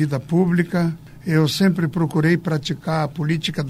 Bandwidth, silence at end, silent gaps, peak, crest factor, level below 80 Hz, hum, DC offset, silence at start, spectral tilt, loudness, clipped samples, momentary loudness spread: 14.5 kHz; 0 s; none; -4 dBFS; 16 dB; -52 dBFS; none; under 0.1%; 0 s; -6.5 dB/octave; -20 LUFS; under 0.1%; 6 LU